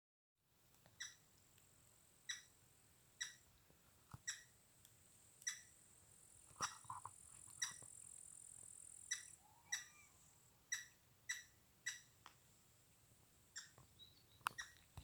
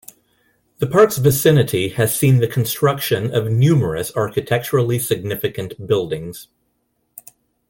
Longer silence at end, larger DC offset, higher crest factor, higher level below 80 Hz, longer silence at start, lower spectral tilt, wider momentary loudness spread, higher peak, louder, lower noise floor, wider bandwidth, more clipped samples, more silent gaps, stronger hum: second, 0 s vs 1.25 s; neither; first, 36 dB vs 16 dB; second, -82 dBFS vs -50 dBFS; second, 0.55 s vs 0.8 s; second, 0.5 dB/octave vs -5.5 dB/octave; first, 20 LU vs 11 LU; second, -20 dBFS vs -2 dBFS; second, -51 LUFS vs -17 LUFS; first, -75 dBFS vs -68 dBFS; first, over 20 kHz vs 17 kHz; neither; neither; neither